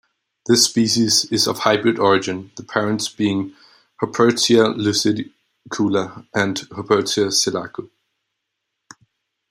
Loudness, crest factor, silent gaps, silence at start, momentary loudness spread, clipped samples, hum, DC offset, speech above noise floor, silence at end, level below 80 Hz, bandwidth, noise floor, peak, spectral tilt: -18 LUFS; 18 dB; none; 0.45 s; 13 LU; under 0.1%; none; under 0.1%; 59 dB; 1.65 s; -62 dBFS; 16 kHz; -78 dBFS; -2 dBFS; -3.5 dB/octave